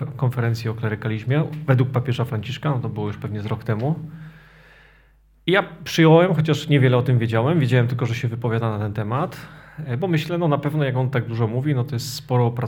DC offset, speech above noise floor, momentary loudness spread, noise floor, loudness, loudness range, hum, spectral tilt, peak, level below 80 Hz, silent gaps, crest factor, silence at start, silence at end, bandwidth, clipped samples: under 0.1%; 34 dB; 10 LU; -55 dBFS; -21 LUFS; 7 LU; none; -7 dB/octave; -2 dBFS; -54 dBFS; none; 20 dB; 0 s; 0 s; 17 kHz; under 0.1%